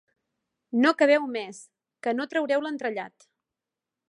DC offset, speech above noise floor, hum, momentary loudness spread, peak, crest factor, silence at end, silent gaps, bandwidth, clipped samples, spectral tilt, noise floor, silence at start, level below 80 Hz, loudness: under 0.1%; 63 dB; none; 15 LU; -6 dBFS; 22 dB; 1 s; none; 11 kHz; under 0.1%; -4 dB/octave; -88 dBFS; 0.75 s; -84 dBFS; -25 LUFS